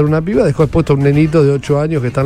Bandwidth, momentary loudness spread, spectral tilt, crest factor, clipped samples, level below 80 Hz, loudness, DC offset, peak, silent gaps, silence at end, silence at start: 10.5 kHz; 4 LU; -8.5 dB/octave; 12 dB; under 0.1%; -32 dBFS; -13 LUFS; under 0.1%; 0 dBFS; none; 0 s; 0 s